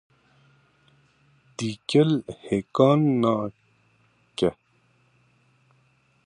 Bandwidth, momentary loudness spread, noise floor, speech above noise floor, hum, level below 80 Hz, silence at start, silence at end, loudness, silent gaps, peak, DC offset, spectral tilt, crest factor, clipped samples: 10.5 kHz; 14 LU; -64 dBFS; 43 dB; none; -62 dBFS; 1.6 s; 1.75 s; -24 LUFS; none; -4 dBFS; under 0.1%; -7 dB/octave; 22 dB; under 0.1%